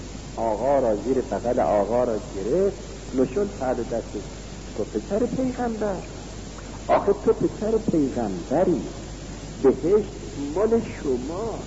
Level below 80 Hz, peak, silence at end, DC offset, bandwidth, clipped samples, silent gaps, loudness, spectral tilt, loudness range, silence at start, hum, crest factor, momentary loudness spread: -40 dBFS; -8 dBFS; 0 s; 0.2%; 8 kHz; under 0.1%; none; -24 LUFS; -6.5 dB/octave; 4 LU; 0 s; none; 16 dB; 15 LU